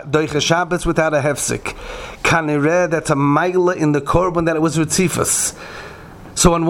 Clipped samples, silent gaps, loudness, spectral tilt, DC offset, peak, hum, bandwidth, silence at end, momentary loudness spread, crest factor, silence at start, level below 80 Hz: under 0.1%; none; -17 LUFS; -4.5 dB/octave; under 0.1%; 0 dBFS; none; 17.5 kHz; 0 s; 14 LU; 18 dB; 0 s; -34 dBFS